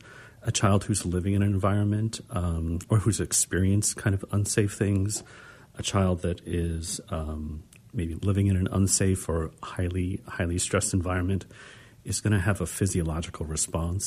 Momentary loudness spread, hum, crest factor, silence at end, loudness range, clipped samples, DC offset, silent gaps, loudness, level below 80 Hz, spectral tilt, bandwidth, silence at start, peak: 10 LU; none; 18 dB; 0 s; 4 LU; under 0.1%; under 0.1%; none; -27 LUFS; -42 dBFS; -5 dB/octave; 15.5 kHz; 0.05 s; -8 dBFS